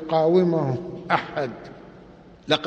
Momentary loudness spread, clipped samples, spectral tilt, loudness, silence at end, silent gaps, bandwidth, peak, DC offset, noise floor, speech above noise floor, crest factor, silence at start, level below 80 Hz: 22 LU; under 0.1%; -7 dB/octave; -23 LUFS; 0 s; none; 8.4 kHz; -4 dBFS; under 0.1%; -47 dBFS; 25 dB; 20 dB; 0 s; -58 dBFS